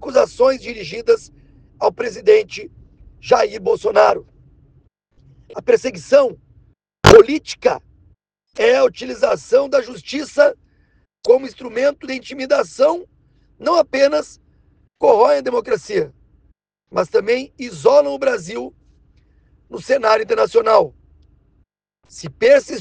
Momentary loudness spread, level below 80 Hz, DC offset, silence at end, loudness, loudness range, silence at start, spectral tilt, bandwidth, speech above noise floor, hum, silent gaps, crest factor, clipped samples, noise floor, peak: 14 LU; -44 dBFS; under 0.1%; 0 s; -16 LUFS; 4 LU; 0 s; -5 dB/octave; 10 kHz; 46 dB; none; none; 18 dB; 0.1%; -61 dBFS; 0 dBFS